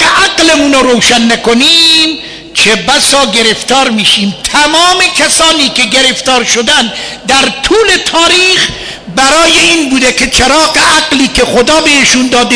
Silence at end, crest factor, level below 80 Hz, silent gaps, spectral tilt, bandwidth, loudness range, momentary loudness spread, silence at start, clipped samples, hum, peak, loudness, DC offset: 0 s; 8 dB; -32 dBFS; none; -1.5 dB/octave; 11 kHz; 1 LU; 5 LU; 0 s; 0.3%; none; 0 dBFS; -5 LUFS; under 0.1%